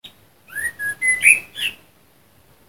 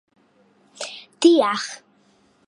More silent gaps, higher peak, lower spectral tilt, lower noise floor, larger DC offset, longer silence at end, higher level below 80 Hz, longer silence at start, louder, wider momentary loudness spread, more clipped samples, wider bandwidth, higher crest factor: neither; first, 0 dBFS vs -4 dBFS; second, 1.5 dB/octave vs -3 dB/octave; second, -55 dBFS vs -59 dBFS; neither; first, 0.95 s vs 0.75 s; first, -60 dBFS vs -80 dBFS; second, 0.05 s vs 0.8 s; about the same, -17 LUFS vs -19 LUFS; second, 14 LU vs 18 LU; neither; first, 16 kHz vs 11 kHz; about the same, 22 dB vs 20 dB